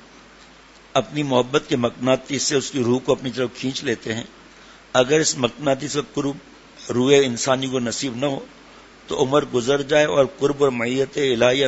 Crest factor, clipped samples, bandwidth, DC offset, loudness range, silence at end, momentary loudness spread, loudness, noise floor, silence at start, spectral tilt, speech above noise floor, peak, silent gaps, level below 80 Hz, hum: 20 dB; under 0.1%; 8 kHz; under 0.1%; 2 LU; 0 s; 9 LU; -21 LUFS; -47 dBFS; 0.95 s; -4 dB/octave; 27 dB; 0 dBFS; none; -54 dBFS; none